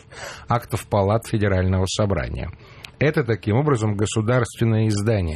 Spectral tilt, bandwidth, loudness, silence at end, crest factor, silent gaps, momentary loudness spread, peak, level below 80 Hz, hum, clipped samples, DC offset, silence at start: -6.5 dB/octave; 14 kHz; -21 LUFS; 0 s; 14 dB; none; 12 LU; -6 dBFS; -40 dBFS; none; under 0.1%; under 0.1%; 0.1 s